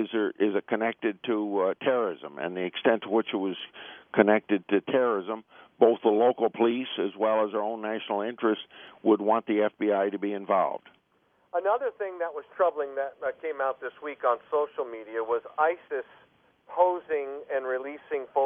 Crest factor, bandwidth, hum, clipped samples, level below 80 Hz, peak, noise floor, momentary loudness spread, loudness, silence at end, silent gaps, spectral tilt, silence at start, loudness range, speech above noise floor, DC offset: 22 dB; 3.7 kHz; none; under 0.1%; -80 dBFS; -4 dBFS; -68 dBFS; 11 LU; -28 LUFS; 0 s; none; -9 dB/octave; 0 s; 5 LU; 41 dB; under 0.1%